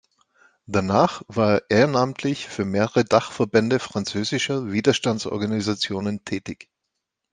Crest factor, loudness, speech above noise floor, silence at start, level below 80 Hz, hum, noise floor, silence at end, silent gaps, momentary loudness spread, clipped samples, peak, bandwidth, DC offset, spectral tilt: 20 dB; -22 LUFS; 59 dB; 0.7 s; -62 dBFS; none; -80 dBFS; 0.8 s; none; 9 LU; under 0.1%; -2 dBFS; 9.8 kHz; under 0.1%; -5 dB/octave